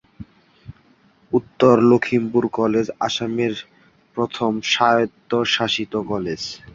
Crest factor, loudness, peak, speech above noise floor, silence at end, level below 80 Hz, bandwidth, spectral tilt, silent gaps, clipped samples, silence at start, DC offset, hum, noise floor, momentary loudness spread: 20 dB; -19 LUFS; -2 dBFS; 37 dB; 0.05 s; -54 dBFS; 7.6 kHz; -5 dB/octave; none; under 0.1%; 0.2 s; under 0.1%; none; -56 dBFS; 10 LU